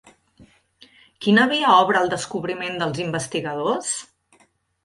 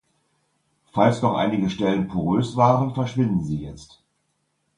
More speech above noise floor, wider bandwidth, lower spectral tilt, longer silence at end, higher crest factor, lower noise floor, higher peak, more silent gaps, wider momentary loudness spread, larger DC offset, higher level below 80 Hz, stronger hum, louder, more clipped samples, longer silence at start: second, 40 dB vs 51 dB; about the same, 11.5 kHz vs 10.5 kHz; second, -4 dB/octave vs -7.5 dB/octave; second, 0.8 s vs 0.95 s; about the same, 20 dB vs 20 dB; second, -61 dBFS vs -72 dBFS; about the same, -2 dBFS vs -4 dBFS; neither; about the same, 11 LU vs 11 LU; neither; second, -62 dBFS vs -50 dBFS; neither; about the same, -21 LUFS vs -22 LUFS; neither; second, 0.4 s vs 0.95 s